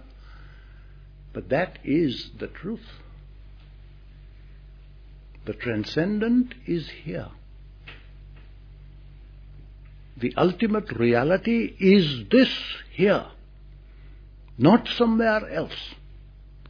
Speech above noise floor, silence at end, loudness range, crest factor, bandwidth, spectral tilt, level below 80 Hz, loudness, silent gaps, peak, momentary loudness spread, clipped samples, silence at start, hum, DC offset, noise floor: 23 dB; 0 s; 15 LU; 22 dB; 5.4 kHz; -7.5 dB/octave; -46 dBFS; -23 LUFS; none; -4 dBFS; 21 LU; under 0.1%; 0 s; none; under 0.1%; -46 dBFS